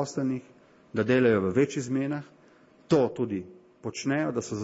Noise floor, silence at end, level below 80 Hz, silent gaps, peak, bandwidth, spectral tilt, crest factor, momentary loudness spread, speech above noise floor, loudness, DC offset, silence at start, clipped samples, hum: -57 dBFS; 0 s; -66 dBFS; none; -12 dBFS; 8 kHz; -6 dB/octave; 16 dB; 14 LU; 31 dB; -27 LUFS; under 0.1%; 0 s; under 0.1%; none